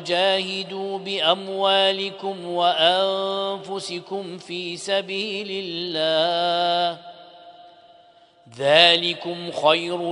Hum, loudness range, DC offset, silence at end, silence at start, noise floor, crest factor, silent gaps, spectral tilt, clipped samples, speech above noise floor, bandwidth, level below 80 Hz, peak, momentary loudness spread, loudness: none; 4 LU; under 0.1%; 0 s; 0 s; -53 dBFS; 22 dB; none; -3.5 dB/octave; under 0.1%; 31 dB; 10.5 kHz; -72 dBFS; 0 dBFS; 12 LU; -21 LUFS